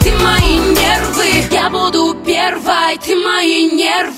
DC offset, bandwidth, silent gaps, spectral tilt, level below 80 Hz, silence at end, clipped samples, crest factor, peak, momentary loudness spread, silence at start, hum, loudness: under 0.1%; 16.5 kHz; none; -4 dB/octave; -24 dBFS; 0 s; under 0.1%; 12 dB; 0 dBFS; 3 LU; 0 s; none; -12 LUFS